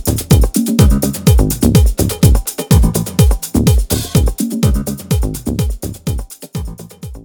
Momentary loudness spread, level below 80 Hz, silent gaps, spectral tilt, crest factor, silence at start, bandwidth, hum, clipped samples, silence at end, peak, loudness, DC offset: 13 LU; -18 dBFS; none; -6 dB/octave; 12 dB; 0 s; 20 kHz; none; under 0.1%; 0.05 s; 0 dBFS; -14 LUFS; under 0.1%